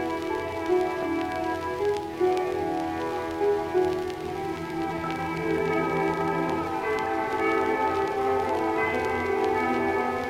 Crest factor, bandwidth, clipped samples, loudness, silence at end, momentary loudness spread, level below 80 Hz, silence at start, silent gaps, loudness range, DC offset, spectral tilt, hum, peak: 12 dB; 16 kHz; under 0.1%; -27 LUFS; 0 s; 5 LU; -56 dBFS; 0 s; none; 2 LU; under 0.1%; -6 dB/octave; none; -14 dBFS